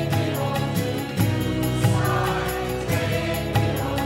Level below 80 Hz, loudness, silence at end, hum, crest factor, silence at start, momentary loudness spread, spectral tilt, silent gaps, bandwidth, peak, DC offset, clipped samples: -38 dBFS; -23 LUFS; 0 s; none; 16 dB; 0 s; 4 LU; -5.5 dB/octave; none; 16.5 kHz; -6 dBFS; under 0.1%; under 0.1%